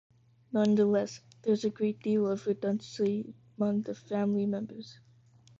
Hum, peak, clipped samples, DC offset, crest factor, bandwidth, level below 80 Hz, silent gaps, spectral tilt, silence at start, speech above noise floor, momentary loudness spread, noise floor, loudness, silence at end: none; -16 dBFS; under 0.1%; under 0.1%; 16 dB; 7.6 kHz; -70 dBFS; none; -7 dB/octave; 0.5 s; 30 dB; 11 LU; -60 dBFS; -31 LUFS; 0.65 s